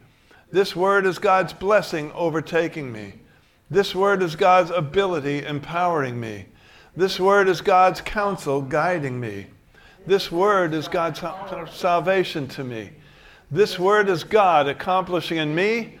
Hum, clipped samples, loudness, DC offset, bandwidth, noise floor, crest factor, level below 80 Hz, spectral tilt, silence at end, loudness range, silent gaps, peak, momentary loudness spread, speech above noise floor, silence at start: none; under 0.1%; -21 LUFS; under 0.1%; 16.5 kHz; -53 dBFS; 18 dB; -52 dBFS; -5.5 dB/octave; 0 s; 3 LU; none; -4 dBFS; 15 LU; 32 dB; 0.5 s